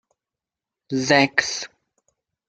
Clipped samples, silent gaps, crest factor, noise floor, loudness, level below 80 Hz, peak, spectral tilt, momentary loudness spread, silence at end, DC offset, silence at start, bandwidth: under 0.1%; none; 24 dB; -88 dBFS; -20 LUFS; -64 dBFS; 0 dBFS; -3.5 dB/octave; 14 LU; 0.8 s; under 0.1%; 0.9 s; 9 kHz